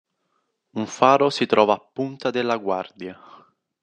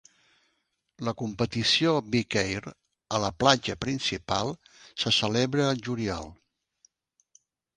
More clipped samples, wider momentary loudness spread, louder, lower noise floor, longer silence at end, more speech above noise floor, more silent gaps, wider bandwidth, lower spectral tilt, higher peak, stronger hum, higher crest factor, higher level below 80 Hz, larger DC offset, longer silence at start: neither; first, 18 LU vs 13 LU; first, -21 LUFS vs -27 LUFS; about the same, -73 dBFS vs -76 dBFS; second, 0.7 s vs 1.4 s; about the same, 51 dB vs 49 dB; neither; about the same, 9.8 kHz vs 10 kHz; about the same, -5 dB/octave vs -4 dB/octave; about the same, -2 dBFS vs -4 dBFS; neither; about the same, 22 dB vs 26 dB; second, -72 dBFS vs -54 dBFS; neither; second, 0.75 s vs 1 s